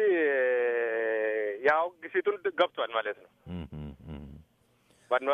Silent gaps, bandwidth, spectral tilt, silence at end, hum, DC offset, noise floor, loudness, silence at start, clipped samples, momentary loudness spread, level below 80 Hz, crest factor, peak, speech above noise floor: none; 6.2 kHz; -6.5 dB/octave; 0 s; none; under 0.1%; -67 dBFS; -29 LUFS; 0 s; under 0.1%; 18 LU; -56 dBFS; 20 dB; -10 dBFS; 36 dB